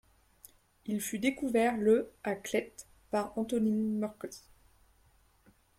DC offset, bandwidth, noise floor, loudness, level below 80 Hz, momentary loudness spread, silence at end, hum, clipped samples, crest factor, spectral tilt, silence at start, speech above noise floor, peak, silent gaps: under 0.1%; 16 kHz; -66 dBFS; -32 LUFS; -66 dBFS; 18 LU; 1.4 s; none; under 0.1%; 18 dB; -5 dB/octave; 0.85 s; 35 dB; -16 dBFS; none